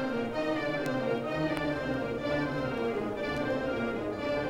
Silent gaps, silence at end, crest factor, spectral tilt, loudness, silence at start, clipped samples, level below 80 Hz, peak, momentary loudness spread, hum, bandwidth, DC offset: none; 0 s; 16 dB; -6.5 dB/octave; -32 LUFS; 0 s; under 0.1%; -54 dBFS; -16 dBFS; 2 LU; none; 16 kHz; under 0.1%